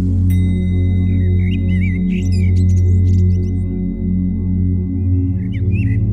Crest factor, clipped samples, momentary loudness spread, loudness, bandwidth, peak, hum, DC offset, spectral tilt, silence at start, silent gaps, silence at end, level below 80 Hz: 10 dB; under 0.1%; 5 LU; -16 LUFS; 6.4 kHz; -4 dBFS; none; 0.9%; -9 dB/octave; 0 s; none; 0 s; -28 dBFS